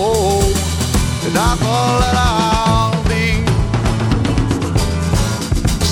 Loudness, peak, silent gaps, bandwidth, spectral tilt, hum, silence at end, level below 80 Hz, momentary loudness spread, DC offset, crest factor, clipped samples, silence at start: -16 LUFS; -2 dBFS; none; 17.5 kHz; -5 dB/octave; none; 0 s; -22 dBFS; 3 LU; under 0.1%; 12 dB; under 0.1%; 0 s